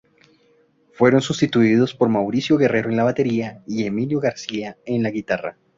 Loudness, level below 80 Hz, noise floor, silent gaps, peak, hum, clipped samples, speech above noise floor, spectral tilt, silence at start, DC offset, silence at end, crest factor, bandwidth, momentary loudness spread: -20 LUFS; -58 dBFS; -59 dBFS; none; -2 dBFS; none; under 0.1%; 39 dB; -6.5 dB/octave; 1 s; under 0.1%; 0.25 s; 18 dB; 7.8 kHz; 9 LU